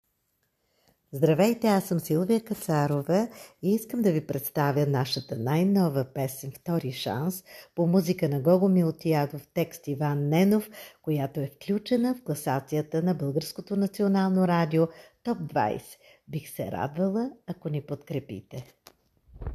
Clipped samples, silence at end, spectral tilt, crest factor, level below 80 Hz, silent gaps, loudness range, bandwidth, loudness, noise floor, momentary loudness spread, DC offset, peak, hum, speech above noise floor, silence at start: under 0.1%; 0 s; -7 dB/octave; 18 dB; -60 dBFS; none; 5 LU; 14.5 kHz; -27 LUFS; -75 dBFS; 12 LU; under 0.1%; -10 dBFS; none; 48 dB; 1.1 s